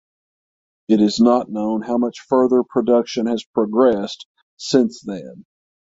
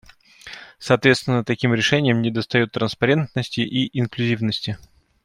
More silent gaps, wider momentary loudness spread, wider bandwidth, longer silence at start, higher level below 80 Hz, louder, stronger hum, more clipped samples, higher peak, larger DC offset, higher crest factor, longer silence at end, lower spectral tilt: first, 3.46-3.54 s, 4.25-4.35 s, 4.43-4.57 s vs none; about the same, 14 LU vs 15 LU; second, 7.8 kHz vs 12 kHz; first, 0.9 s vs 0.45 s; about the same, -60 dBFS vs -56 dBFS; about the same, -18 LUFS vs -20 LUFS; neither; neither; about the same, -2 dBFS vs -2 dBFS; neither; about the same, 16 dB vs 20 dB; about the same, 0.45 s vs 0.45 s; about the same, -6 dB/octave vs -5.5 dB/octave